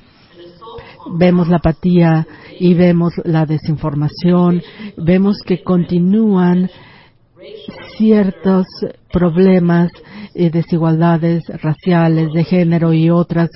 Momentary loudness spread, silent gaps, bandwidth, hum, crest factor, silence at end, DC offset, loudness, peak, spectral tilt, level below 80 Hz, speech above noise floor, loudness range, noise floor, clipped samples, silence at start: 14 LU; none; 5.8 kHz; none; 14 dB; 0.1 s; under 0.1%; -14 LUFS; 0 dBFS; -13 dB/octave; -40 dBFS; 32 dB; 2 LU; -45 dBFS; under 0.1%; 0.4 s